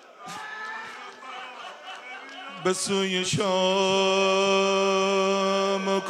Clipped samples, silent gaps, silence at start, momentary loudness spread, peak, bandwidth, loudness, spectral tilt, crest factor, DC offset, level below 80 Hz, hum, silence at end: under 0.1%; none; 0.1 s; 18 LU; -10 dBFS; 13 kHz; -23 LUFS; -3.5 dB/octave; 16 dB; under 0.1%; -72 dBFS; none; 0 s